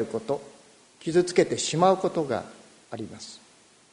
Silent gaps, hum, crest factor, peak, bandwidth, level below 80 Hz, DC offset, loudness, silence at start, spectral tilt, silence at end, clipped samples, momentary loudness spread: none; none; 22 dB; -6 dBFS; 10.5 kHz; -66 dBFS; under 0.1%; -25 LUFS; 0 s; -4.5 dB/octave; 0.55 s; under 0.1%; 20 LU